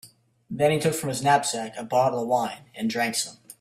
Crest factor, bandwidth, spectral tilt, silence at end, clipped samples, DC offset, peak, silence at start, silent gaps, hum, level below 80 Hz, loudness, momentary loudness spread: 20 dB; 16 kHz; -4 dB/octave; 0.1 s; under 0.1%; under 0.1%; -6 dBFS; 0.05 s; none; none; -64 dBFS; -25 LUFS; 10 LU